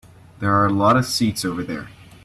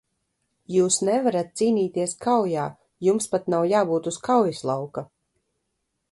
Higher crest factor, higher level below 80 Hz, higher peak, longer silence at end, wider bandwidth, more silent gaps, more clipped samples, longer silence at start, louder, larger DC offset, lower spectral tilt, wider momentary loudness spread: about the same, 18 dB vs 18 dB; first, -50 dBFS vs -68 dBFS; about the same, -4 dBFS vs -6 dBFS; second, 0.35 s vs 1.1 s; first, 14.5 kHz vs 11.5 kHz; neither; neither; second, 0.4 s vs 0.7 s; first, -19 LUFS vs -23 LUFS; neither; about the same, -5 dB/octave vs -5 dB/octave; first, 12 LU vs 8 LU